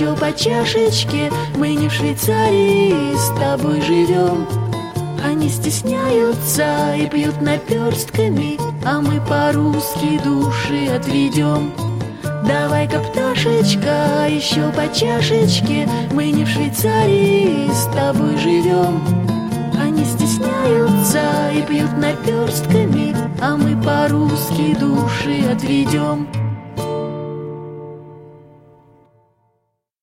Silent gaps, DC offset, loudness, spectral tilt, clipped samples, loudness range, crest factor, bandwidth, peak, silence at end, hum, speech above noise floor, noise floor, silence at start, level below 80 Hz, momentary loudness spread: none; under 0.1%; -17 LUFS; -5.5 dB/octave; under 0.1%; 3 LU; 14 dB; 16.5 kHz; -2 dBFS; 1.65 s; none; 53 dB; -69 dBFS; 0 s; -46 dBFS; 7 LU